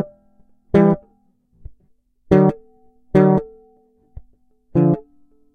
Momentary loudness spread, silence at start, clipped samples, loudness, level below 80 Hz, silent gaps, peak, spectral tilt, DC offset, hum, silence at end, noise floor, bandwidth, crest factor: 13 LU; 0 s; under 0.1%; -17 LUFS; -44 dBFS; none; 0 dBFS; -10.5 dB/octave; under 0.1%; none; 0.55 s; -59 dBFS; 6.2 kHz; 20 dB